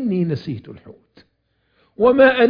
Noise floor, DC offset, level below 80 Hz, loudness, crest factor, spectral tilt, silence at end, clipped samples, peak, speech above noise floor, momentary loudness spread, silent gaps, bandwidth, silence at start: -67 dBFS; under 0.1%; -54 dBFS; -17 LUFS; 18 dB; -9 dB/octave; 0 s; under 0.1%; 0 dBFS; 50 dB; 20 LU; none; 5.2 kHz; 0 s